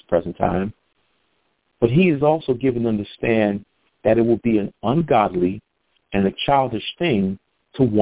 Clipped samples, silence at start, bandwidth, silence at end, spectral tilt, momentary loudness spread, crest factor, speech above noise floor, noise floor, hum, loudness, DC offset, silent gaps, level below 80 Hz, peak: under 0.1%; 0.1 s; 4 kHz; 0 s; -11 dB/octave; 9 LU; 20 dB; 49 dB; -68 dBFS; none; -20 LUFS; 0.2%; none; -48 dBFS; 0 dBFS